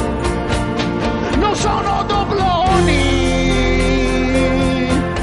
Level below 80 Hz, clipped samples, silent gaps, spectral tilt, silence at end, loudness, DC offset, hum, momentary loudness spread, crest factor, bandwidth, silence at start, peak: -24 dBFS; under 0.1%; none; -5.5 dB/octave; 0 s; -16 LUFS; under 0.1%; none; 5 LU; 14 dB; 11.5 kHz; 0 s; -2 dBFS